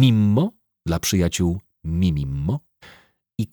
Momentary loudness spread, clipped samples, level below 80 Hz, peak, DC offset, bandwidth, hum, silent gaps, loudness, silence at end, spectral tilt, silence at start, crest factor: 12 LU; under 0.1%; -38 dBFS; -4 dBFS; under 0.1%; over 20 kHz; none; none; -22 LUFS; 0.05 s; -6 dB/octave; 0 s; 16 dB